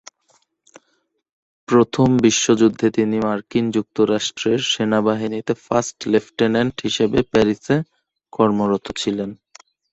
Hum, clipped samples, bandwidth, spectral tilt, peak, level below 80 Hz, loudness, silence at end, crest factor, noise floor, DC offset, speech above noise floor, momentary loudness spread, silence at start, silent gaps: none; under 0.1%; 8.2 kHz; -5 dB/octave; -2 dBFS; -52 dBFS; -19 LUFS; 0.6 s; 18 dB; -68 dBFS; under 0.1%; 50 dB; 8 LU; 1.7 s; none